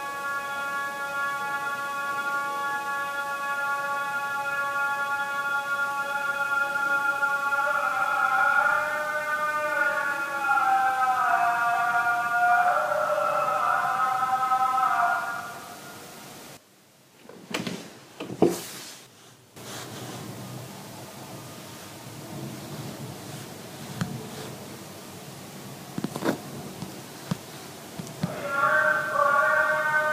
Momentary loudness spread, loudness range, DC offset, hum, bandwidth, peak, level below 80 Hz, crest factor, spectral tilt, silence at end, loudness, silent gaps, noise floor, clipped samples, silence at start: 19 LU; 15 LU; under 0.1%; none; 15.5 kHz; -4 dBFS; -72 dBFS; 22 dB; -4 dB/octave; 0 s; -25 LUFS; none; -57 dBFS; under 0.1%; 0 s